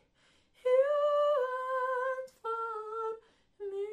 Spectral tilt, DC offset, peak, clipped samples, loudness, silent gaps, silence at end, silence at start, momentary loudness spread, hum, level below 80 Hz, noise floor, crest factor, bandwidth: -2.5 dB/octave; under 0.1%; -18 dBFS; under 0.1%; -32 LUFS; none; 0 s; 0.65 s; 12 LU; none; -78 dBFS; -69 dBFS; 16 dB; 10 kHz